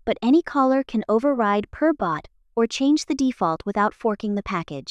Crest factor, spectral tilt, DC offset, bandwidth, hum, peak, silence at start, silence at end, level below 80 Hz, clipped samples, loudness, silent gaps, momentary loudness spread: 14 dB; -5.5 dB/octave; under 0.1%; 10 kHz; none; -8 dBFS; 0.05 s; 0 s; -52 dBFS; under 0.1%; -22 LUFS; none; 7 LU